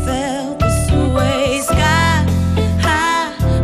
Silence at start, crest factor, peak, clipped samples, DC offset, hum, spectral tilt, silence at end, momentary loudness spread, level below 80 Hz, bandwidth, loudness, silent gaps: 0 s; 10 dB; -4 dBFS; under 0.1%; under 0.1%; none; -5 dB/octave; 0 s; 5 LU; -24 dBFS; 15 kHz; -15 LUFS; none